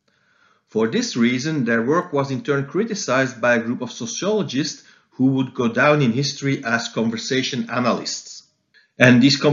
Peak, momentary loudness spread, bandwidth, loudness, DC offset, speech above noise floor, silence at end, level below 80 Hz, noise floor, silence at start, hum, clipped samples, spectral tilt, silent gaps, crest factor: 0 dBFS; 11 LU; 7.6 kHz; -20 LUFS; under 0.1%; 41 dB; 0 s; -68 dBFS; -60 dBFS; 0.75 s; none; under 0.1%; -5 dB/octave; none; 20 dB